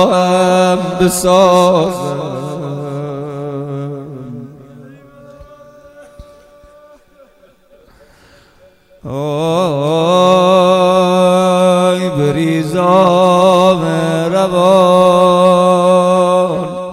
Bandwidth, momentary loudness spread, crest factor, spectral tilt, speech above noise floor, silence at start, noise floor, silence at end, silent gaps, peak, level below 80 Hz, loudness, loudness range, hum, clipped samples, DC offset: 14.5 kHz; 14 LU; 12 dB; -6 dB/octave; 36 dB; 0 s; -47 dBFS; 0 s; none; 0 dBFS; -46 dBFS; -11 LUFS; 17 LU; none; 0.2%; under 0.1%